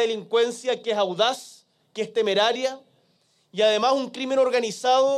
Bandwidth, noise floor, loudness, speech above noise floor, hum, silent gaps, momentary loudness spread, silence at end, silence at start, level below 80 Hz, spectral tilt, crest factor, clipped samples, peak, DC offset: 13 kHz; -65 dBFS; -23 LUFS; 43 dB; none; none; 12 LU; 0 s; 0 s; -80 dBFS; -3 dB/octave; 16 dB; under 0.1%; -8 dBFS; under 0.1%